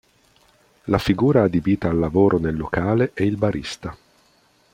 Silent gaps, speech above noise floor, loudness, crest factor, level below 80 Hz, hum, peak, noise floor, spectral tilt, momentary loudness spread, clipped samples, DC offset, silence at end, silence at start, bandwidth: none; 39 dB; -20 LUFS; 20 dB; -44 dBFS; none; -2 dBFS; -59 dBFS; -7.5 dB/octave; 13 LU; under 0.1%; under 0.1%; 0.8 s; 0.85 s; 16 kHz